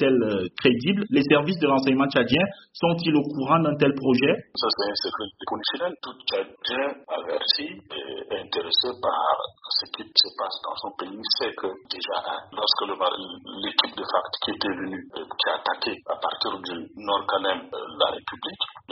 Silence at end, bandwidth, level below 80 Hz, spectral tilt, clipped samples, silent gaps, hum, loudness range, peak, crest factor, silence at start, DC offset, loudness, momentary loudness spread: 0 s; 6 kHz; -64 dBFS; -2.5 dB/octave; under 0.1%; none; none; 5 LU; 0 dBFS; 26 dB; 0 s; under 0.1%; -25 LUFS; 12 LU